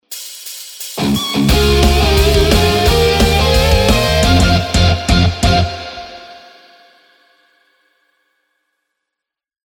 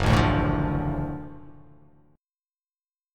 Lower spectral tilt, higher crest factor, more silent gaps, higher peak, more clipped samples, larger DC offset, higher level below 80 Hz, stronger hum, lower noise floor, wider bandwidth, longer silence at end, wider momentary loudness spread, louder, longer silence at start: second, -5 dB/octave vs -7 dB/octave; second, 14 dB vs 22 dB; neither; first, 0 dBFS vs -6 dBFS; neither; neither; first, -20 dBFS vs -36 dBFS; neither; second, -82 dBFS vs under -90 dBFS; first, over 20 kHz vs 13 kHz; first, 3.3 s vs 1.65 s; about the same, 16 LU vs 17 LU; first, -12 LUFS vs -25 LUFS; about the same, 0.1 s vs 0 s